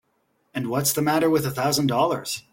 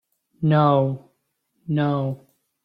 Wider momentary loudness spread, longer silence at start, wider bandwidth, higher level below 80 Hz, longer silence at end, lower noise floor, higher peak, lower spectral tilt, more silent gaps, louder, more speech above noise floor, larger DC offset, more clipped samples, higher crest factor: second, 8 LU vs 19 LU; first, 0.55 s vs 0.4 s; first, 17 kHz vs 5 kHz; about the same, -60 dBFS vs -60 dBFS; second, 0.15 s vs 0.5 s; about the same, -69 dBFS vs -72 dBFS; about the same, -6 dBFS vs -6 dBFS; second, -4.5 dB/octave vs -10 dB/octave; neither; about the same, -22 LUFS vs -21 LUFS; second, 47 dB vs 52 dB; neither; neither; about the same, 16 dB vs 18 dB